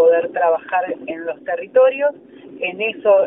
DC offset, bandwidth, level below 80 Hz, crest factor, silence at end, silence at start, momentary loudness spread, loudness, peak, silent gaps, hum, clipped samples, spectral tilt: under 0.1%; 3.6 kHz; -70 dBFS; 14 dB; 0 s; 0 s; 11 LU; -19 LUFS; -4 dBFS; none; none; under 0.1%; -8.5 dB/octave